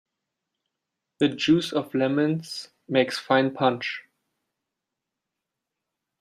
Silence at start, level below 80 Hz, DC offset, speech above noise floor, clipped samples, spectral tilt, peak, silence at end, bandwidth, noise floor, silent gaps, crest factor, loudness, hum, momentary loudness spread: 1.2 s; -68 dBFS; under 0.1%; 61 dB; under 0.1%; -5.5 dB/octave; -6 dBFS; 2.2 s; 14 kHz; -85 dBFS; none; 20 dB; -24 LUFS; none; 11 LU